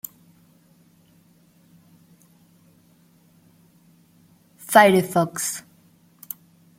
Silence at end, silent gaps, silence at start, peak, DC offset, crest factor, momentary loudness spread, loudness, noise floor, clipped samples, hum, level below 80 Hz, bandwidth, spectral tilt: 1.2 s; none; 4.7 s; -2 dBFS; under 0.1%; 24 dB; 23 LU; -19 LUFS; -57 dBFS; under 0.1%; none; -68 dBFS; 16.5 kHz; -4 dB/octave